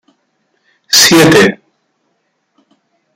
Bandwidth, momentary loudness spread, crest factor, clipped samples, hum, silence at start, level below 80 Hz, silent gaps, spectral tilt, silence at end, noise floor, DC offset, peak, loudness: over 20 kHz; 10 LU; 12 dB; 0.2%; none; 0.9 s; -48 dBFS; none; -3 dB/octave; 1.6 s; -63 dBFS; under 0.1%; 0 dBFS; -6 LUFS